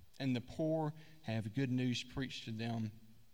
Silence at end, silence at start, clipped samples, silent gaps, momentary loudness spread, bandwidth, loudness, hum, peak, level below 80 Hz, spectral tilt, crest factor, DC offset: 0.2 s; 0 s; under 0.1%; none; 6 LU; 16.5 kHz; -40 LUFS; none; -24 dBFS; -66 dBFS; -6.5 dB/octave; 16 dB; 0.1%